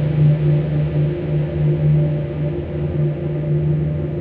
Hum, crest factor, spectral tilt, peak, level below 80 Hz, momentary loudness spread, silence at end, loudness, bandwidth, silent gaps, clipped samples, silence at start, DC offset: none; 12 dB; -12 dB/octave; -6 dBFS; -36 dBFS; 7 LU; 0 s; -19 LUFS; 3.8 kHz; none; under 0.1%; 0 s; under 0.1%